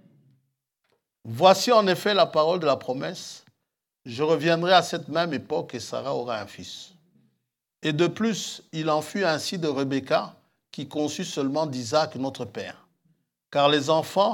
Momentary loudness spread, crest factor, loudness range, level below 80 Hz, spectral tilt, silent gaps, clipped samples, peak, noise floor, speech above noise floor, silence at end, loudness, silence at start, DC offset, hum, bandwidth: 18 LU; 22 dB; 7 LU; -80 dBFS; -4.5 dB/octave; none; under 0.1%; -2 dBFS; -82 dBFS; 58 dB; 0 s; -24 LUFS; 1.25 s; under 0.1%; none; 18 kHz